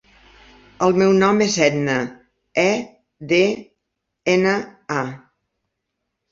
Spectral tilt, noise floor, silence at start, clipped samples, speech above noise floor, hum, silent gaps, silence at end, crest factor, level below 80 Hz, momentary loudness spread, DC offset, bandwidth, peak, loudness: -5 dB/octave; -78 dBFS; 0.8 s; under 0.1%; 60 dB; none; none; 1.15 s; 20 dB; -58 dBFS; 15 LU; under 0.1%; 7.6 kHz; -2 dBFS; -19 LUFS